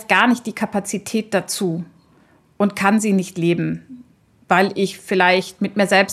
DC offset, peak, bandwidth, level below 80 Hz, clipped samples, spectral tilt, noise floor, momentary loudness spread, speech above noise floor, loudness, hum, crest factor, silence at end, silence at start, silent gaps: under 0.1%; 0 dBFS; 14 kHz; -64 dBFS; under 0.1%; -4.5 dB/octave; -54 dBFS; 9 LU; 36 dB; -19 LUFS; none; 18 dB; 0 s; 0 s; none